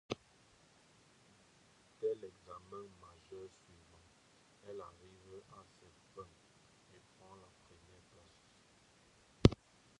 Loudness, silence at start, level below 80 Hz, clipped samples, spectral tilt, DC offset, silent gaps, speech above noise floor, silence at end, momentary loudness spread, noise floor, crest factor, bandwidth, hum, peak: -39 LUFS; 0.1 s; -56 dBFS; under 0.1%; -7 dB/octave; under 0.1%; none; 13 dB; 0.45 s; 31 LU; -68 dBFS; 36 dB; 11 kHz; none; -8 dBFS